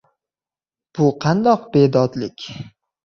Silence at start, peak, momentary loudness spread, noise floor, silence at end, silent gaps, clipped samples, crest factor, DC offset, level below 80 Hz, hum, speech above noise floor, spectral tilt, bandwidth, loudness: 0.95 s; -2 dBFS; 17 LU; under -90 dBFS; 0.45 s; none; under 0.1%; 18 dB; under 0.1%; -56 dBFS; none; over 73 dB; -7.5 dB/octave; 7 kHz; -17 LUFS